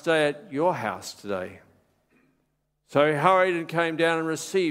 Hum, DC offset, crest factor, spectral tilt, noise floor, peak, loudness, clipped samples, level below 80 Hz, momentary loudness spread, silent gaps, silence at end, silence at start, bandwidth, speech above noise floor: none; under 0.1%; 22 dB; -5 dB/octave; -73 dBFS; -4 dBFS; -24 LUFS; under 0.1%; -70 dBFS; 13 LU; none; 0 s; 0.05 s; 16 kHz; 49 dB